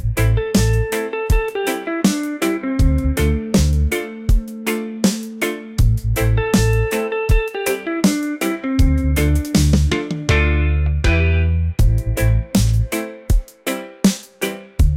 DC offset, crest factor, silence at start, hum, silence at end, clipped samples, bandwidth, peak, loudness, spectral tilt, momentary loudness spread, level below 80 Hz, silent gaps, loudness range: under 0.1%; 14 dB; 0 s; none; 0 s; under 0.1%; 16.5 kHz; -4 dBFS; -19 LUFS; -6 dB/octave; 6 LU; -22 dBFS; none; 2 LU